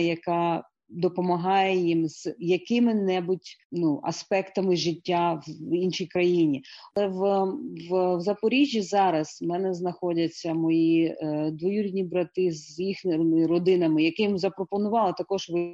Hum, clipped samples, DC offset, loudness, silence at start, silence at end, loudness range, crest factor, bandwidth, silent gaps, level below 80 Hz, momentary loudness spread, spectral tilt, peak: none; under 0.1%; under 0.1%; -26 LUFS; 0 s; 0 s; 2 LU; 14 dB; 7.8 kHz; 3.65-3.70 s; -70 dBFS; 8 LU; -6 dB/octave; -12 dBFS